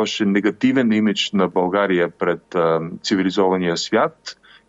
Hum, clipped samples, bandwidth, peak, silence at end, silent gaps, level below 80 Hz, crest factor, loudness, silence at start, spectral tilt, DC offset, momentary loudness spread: none; under 0.1%; 8 kHz; -6 dBFS; 0.35 s; none; -62 dBFS; 14 dB; -19 LUFS; 0 s; -5 dB/octave; under 0.1%; 5 LU